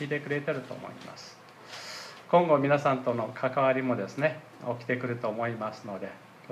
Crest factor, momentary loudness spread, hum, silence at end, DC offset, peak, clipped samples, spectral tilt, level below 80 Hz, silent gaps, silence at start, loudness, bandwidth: 20 dB; 20 LU; none; 0 s; under 0.1%; -10 dBFS; under 0.1%; -6.5 dB/octave; -78 dBFS; none; 0 s; -29 LUFS; 14 kHz